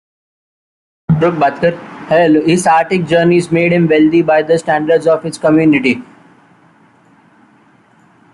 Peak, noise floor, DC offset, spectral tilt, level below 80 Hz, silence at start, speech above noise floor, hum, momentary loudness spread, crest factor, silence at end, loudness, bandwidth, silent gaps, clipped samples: -2 dBFS; -48 dBFS; under 0.1%; -6.5 dB/octave; -52 dBFS; 1.1 s; 37 dB; none; 7 LU; 12 dB; 2.3 s; -12 LUFS; 11.5 kHz; none; under 0.1%